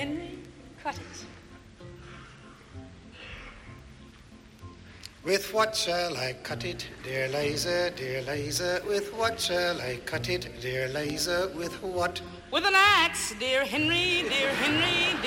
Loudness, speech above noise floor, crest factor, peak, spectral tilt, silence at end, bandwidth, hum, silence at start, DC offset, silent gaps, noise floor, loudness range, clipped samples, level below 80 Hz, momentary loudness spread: -27 LUFS; 23 dB; 20 dB; -10 dBFS; -3 dB/octave; 0 s; 16.5 kHz; none; 0 s; under 0.1%; none; -51 dBFS; 21 LU; under 0.1%; -54 dBFS; 24 LU